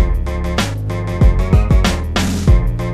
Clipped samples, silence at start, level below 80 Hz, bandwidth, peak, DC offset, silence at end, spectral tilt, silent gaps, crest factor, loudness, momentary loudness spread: under 0.1%; 0 s; -16 dBFS; 14 kHz; 0 dBFS; under 0.1%; 0 s; -6 dB/octave; none; 14 dB; -16 LUFS; 7 LU